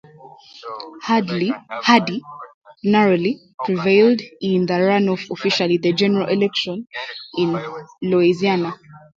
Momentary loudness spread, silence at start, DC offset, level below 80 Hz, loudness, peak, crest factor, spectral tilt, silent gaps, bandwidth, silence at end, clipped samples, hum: 15 LU; 0.25 s; under 0.1%; -64 dBFS; -19 LUFS; 0 dBFS; 20 dB; -6 dB/octave; 2.54-2.61 s, 3.54-3.58 s; 7.6 kHz; 0.2 s; under 0.1%; none